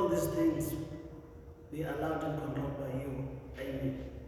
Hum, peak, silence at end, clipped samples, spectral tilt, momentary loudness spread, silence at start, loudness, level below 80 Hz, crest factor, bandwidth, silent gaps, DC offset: none; -20 dBFS; 0 s; under 0.1%; -7 dB/octave; 16 LU; 0 s; -36 LUFS; -52 dBFS; 16 dB; 17 kHz; none; under 0.1%